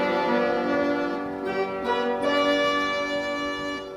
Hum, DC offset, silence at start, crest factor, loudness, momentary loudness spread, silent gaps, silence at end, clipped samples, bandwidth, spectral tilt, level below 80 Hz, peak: none; under 0.1%; 0 s; 14 dB; -25 LUFS; 7 LU; none; 0 s; under 0.1%; 13.5 kHz; -4.5 dB/octave; -58 dBFS; -10 dBFS